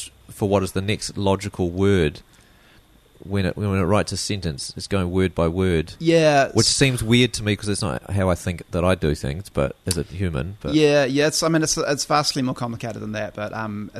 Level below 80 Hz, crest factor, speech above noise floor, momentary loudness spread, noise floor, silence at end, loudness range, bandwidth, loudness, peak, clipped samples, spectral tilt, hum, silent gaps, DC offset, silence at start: -42 dBFS; 18 dB; 32 dB; 11 LU; -53 dBFS; 0 s; 5 LU; 13.5 kHz; -21 LUFS; -4 dBFS; under 0.1%; -4.5 dB/octave; none; none; under 0.1%; 0 s